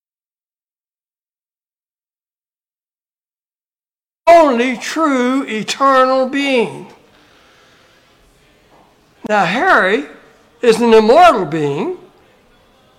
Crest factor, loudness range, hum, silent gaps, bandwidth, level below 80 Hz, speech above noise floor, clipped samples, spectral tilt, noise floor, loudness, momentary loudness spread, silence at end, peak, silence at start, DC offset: 16 dB; 7 LU; none; none; 15.5 kHz; -52 dBFS; over 77 dB; under 0.1%; -4.5 dB/octave; under -90 dBFS; -13 LUFS; 13 LU; 1.05 s; 0 dBFS; 4.25 s; under 0.1%